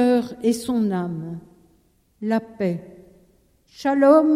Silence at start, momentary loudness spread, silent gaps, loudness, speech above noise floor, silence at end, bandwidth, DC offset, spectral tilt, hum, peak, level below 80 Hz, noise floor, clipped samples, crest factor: 0 s; 16 LU; none; -22 LUFS; 41 dB; 0 s; 15 kHz; under 0.1%; -6.5 dB/octave; none; -4 dBFS; -60 dBFS; -61 dBFS; under 0.1%; 18 dB